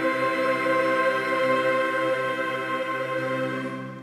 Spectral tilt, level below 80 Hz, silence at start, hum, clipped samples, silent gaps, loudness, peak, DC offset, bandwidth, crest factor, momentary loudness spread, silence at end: -5 dB/octave; -72 dBFS; 0 s; none; under 0.1%; none; -24 LUFS; -12 dBFS; under 0.1%; 15 kHz; 12 dB; 5 LU; 0 s